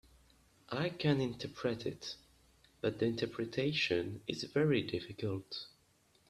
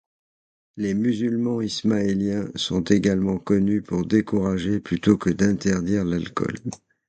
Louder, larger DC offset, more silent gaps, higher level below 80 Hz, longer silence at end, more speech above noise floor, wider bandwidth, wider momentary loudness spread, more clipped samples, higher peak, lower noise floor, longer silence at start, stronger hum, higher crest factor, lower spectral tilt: second, -37 LUFS vs -23 LUFS; neither; neither; second, -68 dBFS vs -48 dBFS; first, 0.6 s vs 0.3 s; second, 35 dB vs over 68 dB; first, 13 kHz vs 9 kHz; first, 13 LU vs 6 LU; neither; second, -18 dBFS vs -4 dBFS; second, -71 dBFS vs under -90 dBFS; about the same, 0.7 s vs 0.75 s; neither; about the same, 20 dB vs 18 dB; about the same, -6 dB/octave vs -6.5 dB/octave